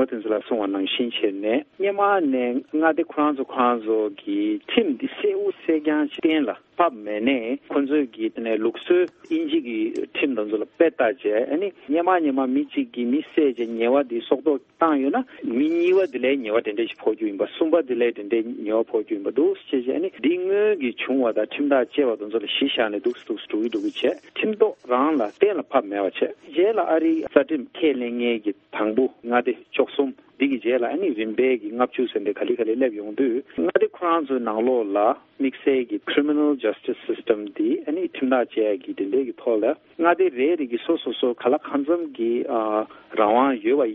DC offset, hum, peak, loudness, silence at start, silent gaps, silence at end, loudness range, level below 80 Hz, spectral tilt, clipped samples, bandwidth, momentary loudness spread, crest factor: under 0.1%; none; -2 dBFS; -23 LUFS; 0 s; none; 0 s; 2 LU; -70 dBFS; -6.5 dB/octave; under 0.1%; 5.6 kHz; 6 LU; 22 dB